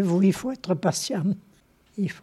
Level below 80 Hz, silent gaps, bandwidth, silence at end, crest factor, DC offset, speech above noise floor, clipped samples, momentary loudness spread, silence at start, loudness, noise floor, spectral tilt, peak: -62 dBFS; none; 13.5 kHz; 0.05 s; 18 dB; under 0.1%; 33 dB; under 0.1%; 11 LU; 0 s; -26 LUFS; -56 dBFS; -6 dB/octave; -8 dBFS